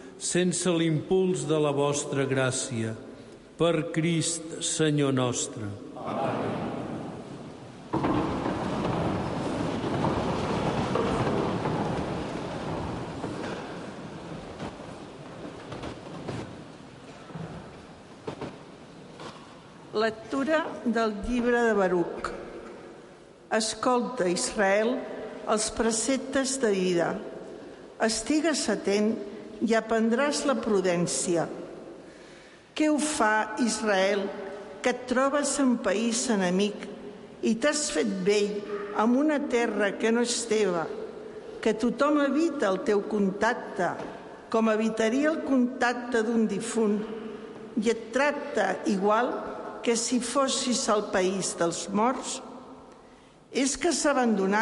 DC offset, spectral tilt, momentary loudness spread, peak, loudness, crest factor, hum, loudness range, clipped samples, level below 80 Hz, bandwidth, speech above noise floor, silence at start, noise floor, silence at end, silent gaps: under 0.1%; -4.5 dB/octave; 17 LU; -12 dBFS; -27 LUFS; 16 dB; none; 10 LU; under 0.1%; -54 dBFS; 11.5 kHz; 27 dB; 0 s; -53 dBFS; 0 s; none